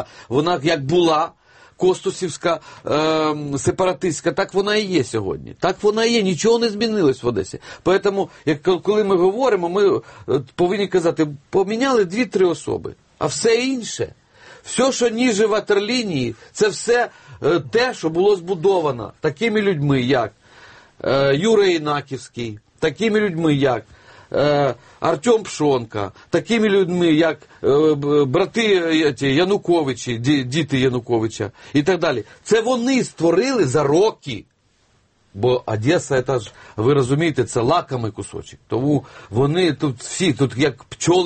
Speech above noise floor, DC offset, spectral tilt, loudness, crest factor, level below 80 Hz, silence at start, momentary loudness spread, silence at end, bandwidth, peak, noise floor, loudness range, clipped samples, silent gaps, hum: 42 dB; under 0.1%; -5 dB/octave; -19 LUFS; 16 dB; -52 dBFS; 0 s; 9 LU; 0 s; 8.8 kHz; -4 dBFS; -60 dBFS; 3 LU; under 0.1%; none; none